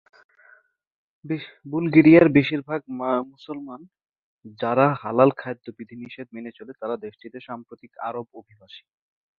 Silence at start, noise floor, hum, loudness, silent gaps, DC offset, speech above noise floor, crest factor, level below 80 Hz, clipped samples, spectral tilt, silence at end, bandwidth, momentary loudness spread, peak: 1.25 s; -57 dBFS; none; -21 LUFS; 4.22-4.39 s; under 0.1%; 35 dB; 22 dB; -62 dBFS; under 0.1%; -10 dB/octave; 0.6 s; 4.7 kHz; 23 LU; -2 dBFS